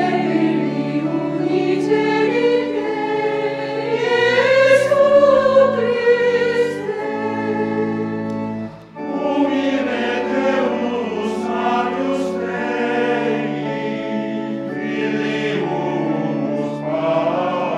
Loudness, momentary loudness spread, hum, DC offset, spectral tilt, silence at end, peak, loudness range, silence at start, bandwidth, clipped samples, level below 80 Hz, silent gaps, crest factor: -18 LUFS; 10 LU; none; under 0.1%; -6 dB/octave; 0 s; -2 dBFS; 7 LU; 0 s; 11.5 kHz; under 0.1%; -60 dBFS; none; 16 dB